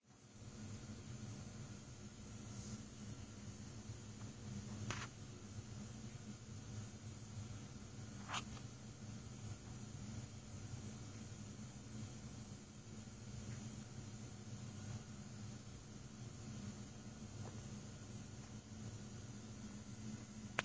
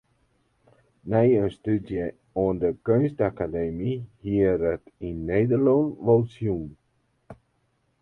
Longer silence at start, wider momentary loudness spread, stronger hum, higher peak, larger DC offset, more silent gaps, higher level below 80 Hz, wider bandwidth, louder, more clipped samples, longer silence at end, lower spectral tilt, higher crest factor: second, 0 s vs 1.05 s; second, 4 LU vs 12 LU; neither; second, -16 dBFS vs -8 dBFS; neither; neither; second, -64 dBFS vs -48 dBFS; first, 8 kHz vs 4.2 kHz; second, -52 LUFS vs -25 LUFS; neither; second, 0 s vs 0.65 s; second, -4.5 dB/octave vs -10.5 dB/octave; first, 36 dB vs 18 dB